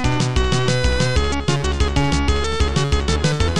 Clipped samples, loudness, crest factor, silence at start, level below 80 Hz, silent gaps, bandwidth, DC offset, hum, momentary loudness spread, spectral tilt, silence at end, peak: under 0.1%; -19 LUFS; 12 dB; 0 s; -22 dBFS; none; 11.5 kHz; 4%; none; 2 LU; -5 dB/octave; 0 s; -4 dBFS